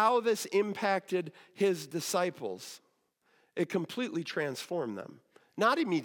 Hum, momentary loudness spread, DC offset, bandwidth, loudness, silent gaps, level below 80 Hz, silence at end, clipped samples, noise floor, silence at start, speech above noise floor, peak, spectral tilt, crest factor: none; 15 LU; under 0.1%; 17.5 kHz; -32 LUFS; none; under -90 dBFS; 0 s; under 0.1%; -73 dBFS; 0 s; 41 dB; -14 dBFS; -4.5 dB/octave; 18 dB